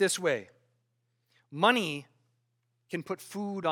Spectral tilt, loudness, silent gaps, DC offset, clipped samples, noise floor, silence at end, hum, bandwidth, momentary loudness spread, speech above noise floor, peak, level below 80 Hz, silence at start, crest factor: -3.5 dB/octave; -30 LUFS; none; under 0.1%; under 0.1%; -77 dBFS; 0 s; none; 18 kHz; 15 LU; 48 dB; -8 dBFS; -88 dBFS; 0 s; 24 dB